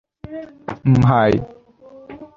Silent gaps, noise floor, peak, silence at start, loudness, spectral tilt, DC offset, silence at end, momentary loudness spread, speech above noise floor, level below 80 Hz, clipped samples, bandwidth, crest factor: none; -44 dBFS; -2 dBFS; 0.3 s; -16 LUFS; -9 dB/octave; under 0.1%; 0.1 s; 24 LU; 27 dB; -42 dBFS; under 0.1%; 7.2 kHz; 16 dB